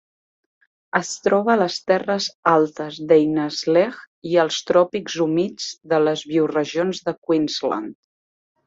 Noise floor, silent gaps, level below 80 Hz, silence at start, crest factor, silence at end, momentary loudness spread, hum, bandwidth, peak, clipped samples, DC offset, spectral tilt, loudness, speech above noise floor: under -90 dBFS; 2.35-2.43 s, 4.07-4.22 s, 7.18-7.22 s; -66 dBFS; 0.95 s; 18 dB; 0.75 s; 8 LU; none; 8 kHz; -2 dBFS; under 0.1%; under 0.1%; -4.5 dB/octave; -20 LUFS; over 70 dB